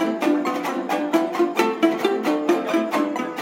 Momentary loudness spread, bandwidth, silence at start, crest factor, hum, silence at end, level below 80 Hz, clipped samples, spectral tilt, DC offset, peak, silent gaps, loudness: 4 LU; 17 kHz; 0 s; 18 dB; none; 0 s; -74 dBFS; under 0.1%; -4.5 dB/octave; under 0.1%; -4 dBFS; none; -22 LUFS